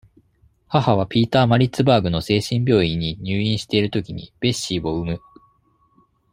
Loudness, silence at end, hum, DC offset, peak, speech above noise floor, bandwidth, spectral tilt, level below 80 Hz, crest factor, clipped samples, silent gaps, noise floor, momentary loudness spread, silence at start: -20 LUFS; 1.15 s; none; under 0.1%; -2 dBFS; 42 dB; 16 kHz; -6 dB/octave; -46 dBFS; 18 dB; under 0.1%; none; -61 dBFS; 9 LU; 0.7 s